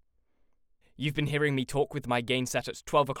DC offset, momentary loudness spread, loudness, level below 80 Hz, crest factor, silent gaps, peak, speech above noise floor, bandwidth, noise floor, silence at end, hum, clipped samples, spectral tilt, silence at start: under 0.1%; 5 LU; -30 LUFS; -56 dBFS; 20 dB; none; -10 dBFS; 38 dB; 17 kHz; -67 dBFS; 0 s; none; under 0.1%; -5 dB/octave; 1 s